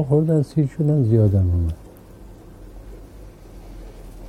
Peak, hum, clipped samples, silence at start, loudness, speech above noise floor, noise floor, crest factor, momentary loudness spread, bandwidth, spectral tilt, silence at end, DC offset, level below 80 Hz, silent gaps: -6 dBFS; none; under 0.1%; 0 s; -19 LUFS; 24 dB; -42 dBFS; 16 dB; 25 LU; 10.5 kHz; -10.5 dB/octave; 0 s; under 0.1%; -40 dBFS; none